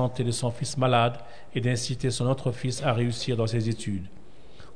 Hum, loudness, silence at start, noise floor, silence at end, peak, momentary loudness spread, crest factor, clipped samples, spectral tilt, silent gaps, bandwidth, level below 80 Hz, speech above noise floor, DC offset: none; -27 LUFS; 0 s; -50 dBFS; 0.05 s; -10 dBFS; 10 LU; 18 dB; under 0.1%; -5.5 dB/octave; none; 10 kHz; -54 dBFS; 23 dB; 1%